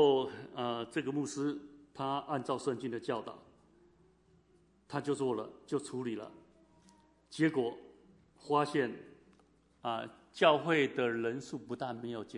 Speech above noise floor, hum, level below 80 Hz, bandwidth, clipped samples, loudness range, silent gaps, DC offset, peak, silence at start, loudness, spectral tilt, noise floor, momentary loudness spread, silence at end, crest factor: 33 dB; none; -76 dBFS; 11 kHz; under 0.1%; 7 LU; none; under 0.1%; -14 dBFS; 0 s; -35 LUFS; -5.5 dB/octave; -68 dBFS; 16 LU; 0 s; 22 dB